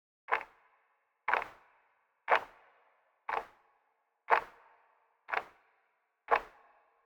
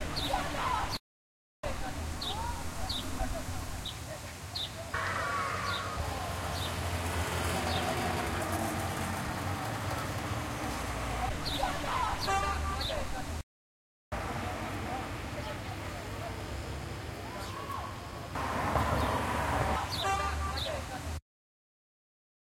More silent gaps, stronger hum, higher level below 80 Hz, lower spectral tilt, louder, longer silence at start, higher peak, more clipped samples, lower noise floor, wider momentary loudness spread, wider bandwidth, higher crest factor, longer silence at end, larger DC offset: second, none vs 1.00-1.63 s, 13.43-14.11 s; neither; second, -74 dBFS vs -44 dBFS; second, -2.5 dB/octave vs -4 dB/octave; about the same, -34 LUFS vs -35 LUFS; first, 0.3 s vs 0 s; first, -12 dBFS vs -16 dBFS; neither; second, -78 dBFS vs under -90 dBFS; first, 22 LU vs 9 LU; first, 20 kHz vs 16.5 kHz; first, 26 dB vs 18 dB; second, 0.55 s vs 1.4 s; neither